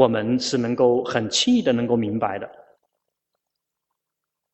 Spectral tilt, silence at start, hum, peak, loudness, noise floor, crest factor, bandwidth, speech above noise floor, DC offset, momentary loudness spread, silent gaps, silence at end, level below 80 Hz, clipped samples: -4.5 dB/octave; 0 s; none; -2 dBFS; -21 LUFS; -83 dBFS; 20 dB; 8.4 kHz; 63 dB; under 0.1%; 8 LU; none; 2 s; -60 dBFS; under 0.1%